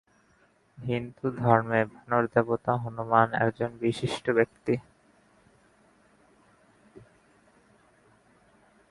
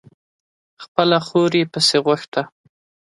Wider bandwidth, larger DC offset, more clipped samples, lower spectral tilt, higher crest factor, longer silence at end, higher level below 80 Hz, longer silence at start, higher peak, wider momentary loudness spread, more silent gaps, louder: about the same, 11.5 kHz vs 11.5 kHz; neither; neither; first, -7 dB/octave vs -4.5 dB/octave; first, 26 dB vs 20 dB; first, 1.9 s vs 0.6 s; about the same, -64 dBFS vs -66 dBFS; about the same, 0.8 s vs 0.8 s; second, -4 dBFS vs 0 dBFS; about the same, 9 LU vs 10 LU; second, none vs 0.88-0.95 s, 2.28-2.32 s; second, -27 LUFS vs -18 LUFS